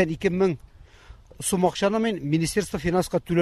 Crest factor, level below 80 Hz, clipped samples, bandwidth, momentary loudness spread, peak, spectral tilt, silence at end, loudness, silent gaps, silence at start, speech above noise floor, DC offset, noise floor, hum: 16 dB; -46 dBFS; under 0.1%; 14 kHz; 4 LU; -8 dBFS; -5.5 dB/octave; 0 s; -24 LUFS; none; 0 s; 24 dB; under 0.1%; -48 dBFS; none